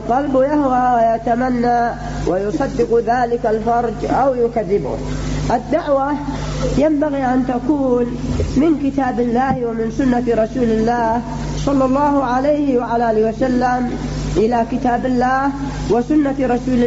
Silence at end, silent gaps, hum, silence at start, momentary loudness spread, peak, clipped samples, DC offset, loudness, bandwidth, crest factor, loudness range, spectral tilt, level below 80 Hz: 0 s; none; 50 Hz at -30 dBFS; 0 s; 6 LU; -6 dBFS; under 0.1%; under 0.1%; -17 LUFS; 8 kHz; 10 dB; 2 LU; -7 dB/octave; -32 dBFS